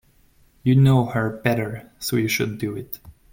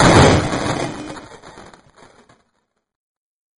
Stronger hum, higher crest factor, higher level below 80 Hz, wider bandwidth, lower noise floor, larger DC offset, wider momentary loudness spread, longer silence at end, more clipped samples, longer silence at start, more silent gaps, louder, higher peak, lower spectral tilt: neither; about the same, 18 dB vs 18 dB; second, -52 dBFS vs -34 dBFS; first, 17 kHz vs 11 kHz; second, -57 dBFS vs -69 dBFS; neither; second, 16 LU vs 27 LU; second, 0.2 s vs 2.1 s; neither; first, 0.65 s vs 0 s; neither; second, -21 LUFS vs -15 LUFS; second, -4 dBFS vs 0 dBFS; first, -6.5 dB/octave vs -5 dB/octave